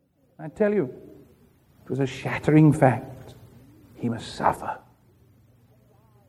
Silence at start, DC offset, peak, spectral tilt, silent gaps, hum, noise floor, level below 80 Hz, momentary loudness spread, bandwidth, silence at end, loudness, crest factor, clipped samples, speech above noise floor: 0.4 s; under 0.1%; -4 dBFS; -8 dB/octave; none; none; -58 dBFS; -56 dBFS; 24 LU; 12.5 kHz; 1.5 s; -24 LUFS; 22 dB; under 0.1%; 35 dB